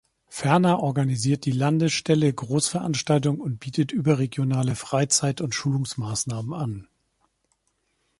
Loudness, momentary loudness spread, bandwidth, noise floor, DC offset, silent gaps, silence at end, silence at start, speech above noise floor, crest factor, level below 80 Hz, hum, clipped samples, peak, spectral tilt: -24 LUFS; 8 LU; 11.5 kHz; -72 dBFS; under 0.1%; none; 1.35 s; 0.3 s; 49 dB; 20 dB; -58 dBFS; none; under 0.1%; -4 dBFS; -5 dB/octave